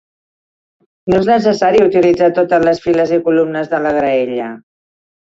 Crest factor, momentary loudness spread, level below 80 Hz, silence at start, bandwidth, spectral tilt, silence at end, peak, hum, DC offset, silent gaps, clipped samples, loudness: 12 dB; 7 LU; -48 dBFS; 1.05 s; 7.8 kHz; -7 dB/octave; 0.8 s; -2 dBFS; none; under 0.1%; none; under 0.1%; -13 LUFS